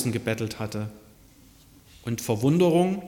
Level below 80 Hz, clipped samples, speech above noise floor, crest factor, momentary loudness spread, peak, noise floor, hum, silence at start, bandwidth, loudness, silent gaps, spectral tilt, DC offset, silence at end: -58 dBFS; under 0.1%; 29 dB; 16 dB; 15 LU; -10 dBFS; -53 dBFS; none; 0 s; 17.5 kHz; -25 LUFS; none; -6.5 dB/octave; under 0.1%; 0 s